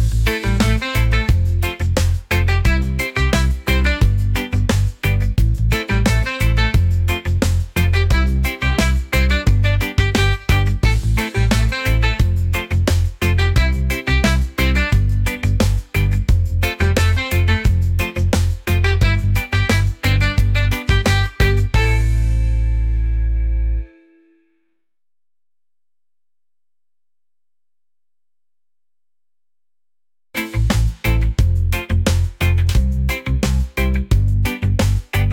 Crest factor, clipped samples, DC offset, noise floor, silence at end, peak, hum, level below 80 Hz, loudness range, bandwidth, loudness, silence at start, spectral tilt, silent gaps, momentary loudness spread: 14 dB; under 0.1%; under 0.1%; under -90 dBFS; 0 s; -4 dBFS; none; -20 dBFS; 5 LU; 17 kHz; -18 LUFS; 0 s; -5.5 dB/octave; none; 4 LU